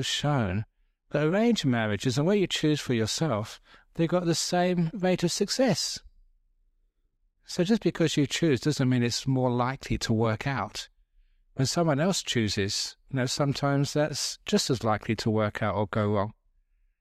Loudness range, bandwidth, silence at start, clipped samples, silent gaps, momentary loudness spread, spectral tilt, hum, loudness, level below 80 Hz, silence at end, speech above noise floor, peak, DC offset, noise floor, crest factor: 2 LU; 15.5 kHz; 0 s; under 0.1%; none; 7 LU; -5 dB/octave; none; -27 LUFS; -54 dBFS; 0.7 s; 45 dB; -12 dBFS; under 0.1%; -71 dBFS; 16 dB